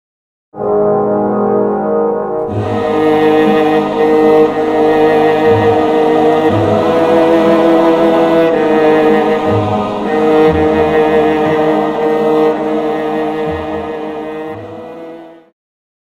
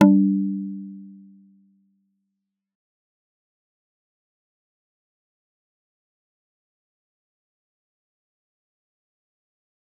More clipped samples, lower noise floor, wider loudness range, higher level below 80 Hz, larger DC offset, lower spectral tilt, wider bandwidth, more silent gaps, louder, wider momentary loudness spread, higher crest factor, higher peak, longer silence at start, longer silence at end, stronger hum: neither; second, -32 dBFS vs -81 dBFS; second, 5 LU vs 23 LU; first, -42 dBFS vs -78 dBFS; neither; second, -7.5 dB/octave vs -9 dB/octave; first, 10.5 kHz vs 3.6 kHz; neither; first, -11 LUFS vs -21 LUFS; second, 11 LU vs 25 LU; second, 12 dB vs 26 dB; about the same, 0 dBFS vs -2 dBFS; first, 0.55 s vs 0 s; second, 0.75 s vs 8.9 s; neither